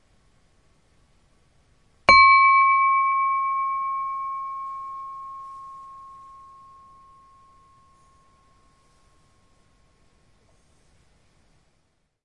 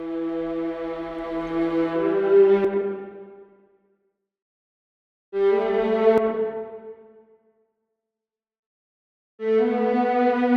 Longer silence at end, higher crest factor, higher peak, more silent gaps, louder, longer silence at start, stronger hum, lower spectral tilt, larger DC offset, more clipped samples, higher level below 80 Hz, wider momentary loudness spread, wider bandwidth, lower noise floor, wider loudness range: first, 6.15 s vs 0 s; first, 24 dB vs 18 dB; first, 0 dBFS vs -6 dBFS; second, none vs 4.42-5.32 s, 8.59-9.38 s; first, -18 LUFS vs -22 LUFS; first, 2.1 s vs 0 s; neither; second, -2 dB/octave vs -8 dB/octave; neither; neither; about the same, -56 dBFS vs -58 dBFS; first, 28 LU vs 16 LU; first, 9.6 kHz vs 5.2 kHz; second, -70 dBFS vs -89 dBFS; first, 21 LU vs 7 LU